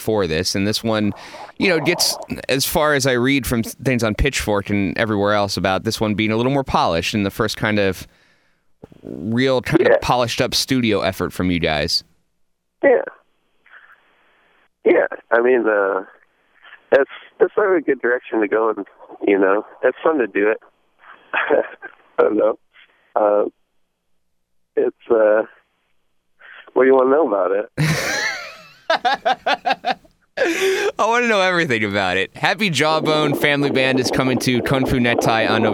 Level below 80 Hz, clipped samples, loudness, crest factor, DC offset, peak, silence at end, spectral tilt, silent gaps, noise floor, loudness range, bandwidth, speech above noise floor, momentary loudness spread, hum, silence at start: -42 dBFS; under 0.1%; -18 LUFS; 20 dB; under 0.1%; 0 dBFS; 0 s; -4.5 dB/octave; none; -68 dBFS; 4 LU; 19 kHz; 50 dB; 8 LU; none; 0 s